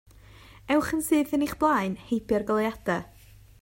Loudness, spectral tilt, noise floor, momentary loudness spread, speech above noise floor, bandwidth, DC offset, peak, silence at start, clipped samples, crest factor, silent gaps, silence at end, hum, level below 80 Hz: -26 LUFS; -5 dB/octave; -50 dBFS; 6 LU; 25 dB; 16.5 kHz; under 0.1%; -10 dBFS; 0.65 s; under 0.1%; 16 dB; none; 0.55 s; none; -52 dBFS